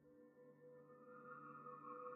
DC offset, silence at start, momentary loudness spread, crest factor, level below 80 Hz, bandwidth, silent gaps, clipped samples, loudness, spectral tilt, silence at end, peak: under 0.1%; 0 s; 11 LU; 16 dB; under -90 dBFS; 3.6 kHz; none; under 0.1%; -59 LUFS; -2.5 dB/octave; 0 s; -42 dBFS